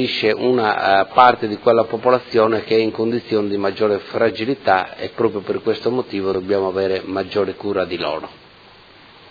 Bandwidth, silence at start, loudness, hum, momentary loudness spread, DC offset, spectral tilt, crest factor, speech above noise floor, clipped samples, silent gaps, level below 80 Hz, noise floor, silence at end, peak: 5.4 kHz; 0 s; -18 LUFS; none; 7 LU; under 0.1%; -7 dB/octave; 18 dB; 28 dB; under 0.1%; none; -58 dBFS; -45 dBFS; 0.95 s; 0 dBFS